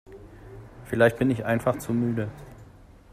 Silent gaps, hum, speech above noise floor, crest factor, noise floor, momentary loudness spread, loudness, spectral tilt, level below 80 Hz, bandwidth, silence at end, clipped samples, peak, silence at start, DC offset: none; none; 26 dB; 22 dB; -50 dBFS; 25 LU; -25 LUFS; -7 dB/octave; -52 dBFS; 15.5 kHz; 0.5 s; under 0.1%; -6 dBFS; 0.1 s; under 0.1%